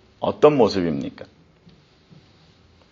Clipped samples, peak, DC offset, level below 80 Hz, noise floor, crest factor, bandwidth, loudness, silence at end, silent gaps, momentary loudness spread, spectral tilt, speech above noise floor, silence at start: under 0.1%; -2 dBFS; under 0.1%; -56 dBFS; -54 dBFS; 22 dB; 7.4 kHz; -19 LUFS; 1.7 s; none; 14 LU; -5.5 dB/octave; 35 dB; 0.2 s